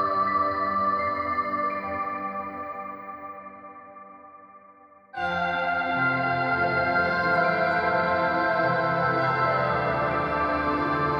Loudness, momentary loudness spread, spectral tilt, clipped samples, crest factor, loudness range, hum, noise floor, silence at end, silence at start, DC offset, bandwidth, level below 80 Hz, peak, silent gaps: -25 LUFS; 15 LU; -7.5 dB/octave; under 0.1%; 14 dB; 11 LU; none; -52 dBFS; 0 s; 0 s; under 0.1%; 7.4 kHz; -52 dBFS; -12 dBFS; none